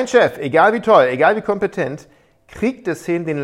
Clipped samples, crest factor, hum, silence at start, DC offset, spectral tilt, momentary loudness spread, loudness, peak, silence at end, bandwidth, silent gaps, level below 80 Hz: under 0.1%; 16 dB; none; 0 s; under 0.1%; -5.5 dB/octave; 12 LU; -16 LUFS; 0 dBFS; 0 s; 13.5 kHz; none; -54 dBFS